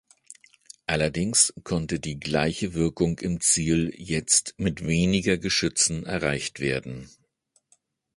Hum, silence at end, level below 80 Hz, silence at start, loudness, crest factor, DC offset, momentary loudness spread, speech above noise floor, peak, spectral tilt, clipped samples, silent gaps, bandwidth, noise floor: none; 1.1 s; -46 dBFS; 0.9 s; -24 LUFS; 22 dB; under 0.1%; 9 LU; 44 dB; -6 dBFS; -3.5 dB/octave; under 0.1%; none; 11.5 kHz; -69 dBFS